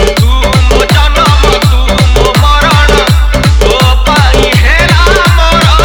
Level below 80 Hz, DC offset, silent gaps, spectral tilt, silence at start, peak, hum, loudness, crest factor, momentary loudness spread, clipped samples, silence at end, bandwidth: -8 dBFS; under 0.1%; none; -4.5 dB/octave; 0 s; 0 dBFS; none; -6 LUFS; 6 dB; 2 LU; 3%; 0 s; 19 kHz